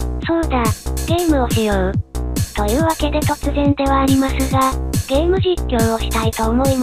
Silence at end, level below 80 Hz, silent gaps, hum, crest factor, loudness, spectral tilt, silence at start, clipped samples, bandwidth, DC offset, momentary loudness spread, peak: 0 s; -24 dBFS; none; none; 14 dB; -17 LUFS; -5.5 dB/octave; 0 s; under 0.1%; 15.5 kHz; 0.3%; 5 LU; -4 dBFS